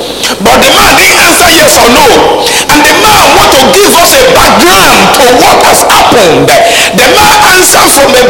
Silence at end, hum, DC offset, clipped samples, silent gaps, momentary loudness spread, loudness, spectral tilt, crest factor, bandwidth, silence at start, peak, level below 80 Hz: 0 s; none; 2%; 9%; none; 3 LU; -1 LUFS; -2 dB/octave; 2 dB; over 20 kHz; 0 s; 0 dBFS; -26 dBFS